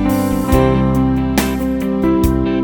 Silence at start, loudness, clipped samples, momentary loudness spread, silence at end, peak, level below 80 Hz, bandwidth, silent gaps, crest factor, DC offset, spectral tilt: 0 s; -15 LUFS; under 0.1%; 4 LU; 0 s; 0 dBFS; -24 dBFS; 19 kHz; none; 14 dB; 0.3%; -7 dB/octave